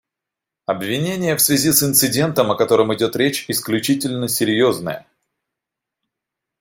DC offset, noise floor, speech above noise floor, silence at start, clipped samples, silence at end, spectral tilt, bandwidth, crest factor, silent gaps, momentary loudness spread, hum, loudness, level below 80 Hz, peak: under 0.1%; -85 dBFS; 67 dB; 0.7 s; under 0.1%; 1.6 s; -3.5 dB/octave; 17 kHz; 18 dB; none; 11 LU; none; -17 LUFS; -58 dBFS; 0 dBFS